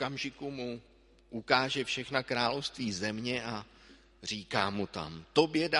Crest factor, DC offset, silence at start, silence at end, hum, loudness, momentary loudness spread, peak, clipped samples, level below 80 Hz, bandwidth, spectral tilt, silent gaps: 26 dB; under 0.1%; 0 s; 0 s; none; -33 LUFS; 13 LU; -6 dBFS; under 0.1%; -62 dBFS; 11.5 kHz; -4 dB/octave; none